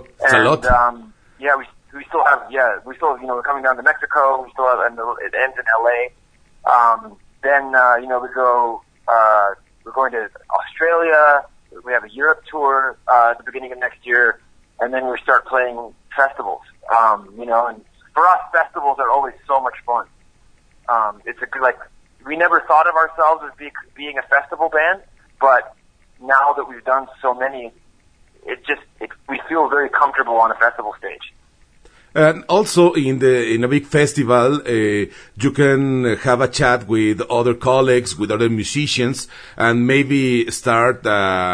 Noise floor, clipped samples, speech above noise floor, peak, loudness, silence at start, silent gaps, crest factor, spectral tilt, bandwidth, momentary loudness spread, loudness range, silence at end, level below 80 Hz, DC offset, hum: -52 dBFS; under 0.1%; 36 dB; 0 dBFS; -17 LUFS; 0.2 s; none; 16 dB; -5 dB/octave; 11 kHz; 13 LU; 3 LU; 0 s; -44 dBFS; under 0.1%; none